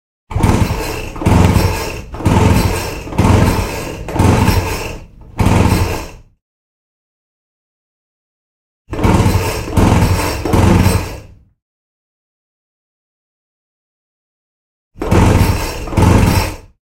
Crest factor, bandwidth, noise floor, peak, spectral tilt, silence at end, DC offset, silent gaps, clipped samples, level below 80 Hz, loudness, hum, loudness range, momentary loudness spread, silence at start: 16 dB; 16.5 kHz; -34 dBFS; 0 dBFS; -6 dB/octave; 0.4 s; under 0.1%; 6.42-8.85 s, 11.62-14.91 s; under 0.1%; -24 dBFS; -14 LUFS; none; 7 LU; 13 LU; 0.3 s